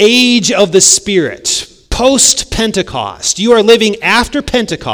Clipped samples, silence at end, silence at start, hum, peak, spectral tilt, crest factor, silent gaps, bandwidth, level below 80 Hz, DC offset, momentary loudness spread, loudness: 2%; 0 s; 0 s; none; 0 dBFS; -2 dB/octave; 10 dB; none; over 20 kHz; -32 dBFS; under 0.1%; 9 LU; -10 LUFS